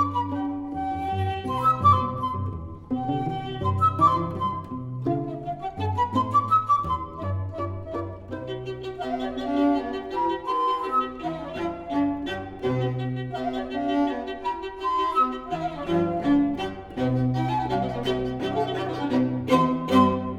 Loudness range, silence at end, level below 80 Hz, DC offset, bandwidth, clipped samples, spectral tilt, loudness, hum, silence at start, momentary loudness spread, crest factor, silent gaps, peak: 4 LU; 0 s; -50 dBFS; under 0.1%; 13 kHz; under 0.1%; -7.5 dB/octave; -26 LUFS; none; 0 s; 11 LU; 20 dB; none; -4 dBFS